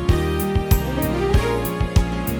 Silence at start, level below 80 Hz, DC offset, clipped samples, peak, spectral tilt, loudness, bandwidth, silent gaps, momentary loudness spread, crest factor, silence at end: 0 s; -24 dBFS; under 0.1%; under 0.1%; -4 dBFS; -6.5 dB/octave; -21 LUFS; over 20 kHz; none; 3 LU; 16 dB; 0 s